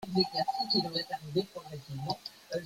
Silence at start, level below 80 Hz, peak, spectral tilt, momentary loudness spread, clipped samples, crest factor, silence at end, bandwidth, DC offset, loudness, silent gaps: 0 s; -68 dBFS; -14 dBFS; -5.5 dB/octave; 13 LU; under 0.1%; 20 dB; 0 s; 16.5 kHz; under 0.1%; -33 LUFS; none